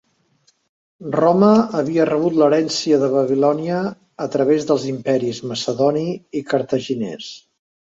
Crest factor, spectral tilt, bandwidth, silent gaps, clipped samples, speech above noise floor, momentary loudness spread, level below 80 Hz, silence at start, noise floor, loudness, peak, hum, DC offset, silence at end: 18 dB; -6 dB/octave; 8 kHz; none; under 0.1%; 44 dB; 12 LU; -62 dBFS; 1 s; -61 dBFS; -18 LUFS; 0 dBFS; none; under 0.1%; 0.45 s